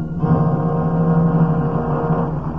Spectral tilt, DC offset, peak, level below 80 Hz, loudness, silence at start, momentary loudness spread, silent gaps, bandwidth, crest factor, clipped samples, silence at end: -12 dB/octave; 1%; -6 dBFS; -36 dBFS; -18 LUFS; 0 s; 4 LU; none; 3.1 kHz; 12 dB; under 0.1%; 0 s